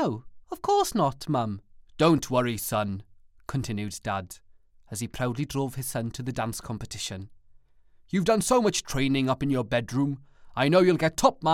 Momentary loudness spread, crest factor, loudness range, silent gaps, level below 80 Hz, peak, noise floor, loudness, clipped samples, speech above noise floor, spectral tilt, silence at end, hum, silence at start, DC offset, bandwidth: 15 LU; 20 dB; 8 LU; none; -50 dBFS; -6 dBFS; -56 dBFS; -27 LUFS; under 0.1%; 31 dB; -5 dB/octave; 0 s; none; 0 s; under 0.1%; 17.5 kHz